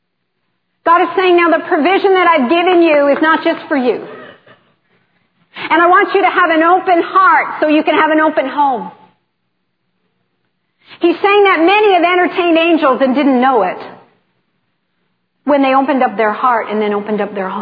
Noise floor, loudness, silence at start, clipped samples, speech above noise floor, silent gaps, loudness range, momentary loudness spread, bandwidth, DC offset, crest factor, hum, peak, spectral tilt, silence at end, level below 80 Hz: -69 dBFS; -11 LUFS; 0.85 s; under 0.1%; 58 dB; none; 5 LU; 8 LU; 5 kHz; under 0.1%; 12 dB; none; 0 dBFS; -7.5 dB/octave; 0 s; -68 dBFS